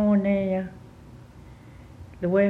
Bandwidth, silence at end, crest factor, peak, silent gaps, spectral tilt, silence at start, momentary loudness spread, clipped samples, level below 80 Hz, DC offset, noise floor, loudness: 4.2 kHz; 0 s; 16 dB; -10 dBFS; none; -9.5 dB/octave; 0 s; 25 LU; under 0.1%; -52 dBFS; under 0.1%; -46 dBFS; -25 LUFS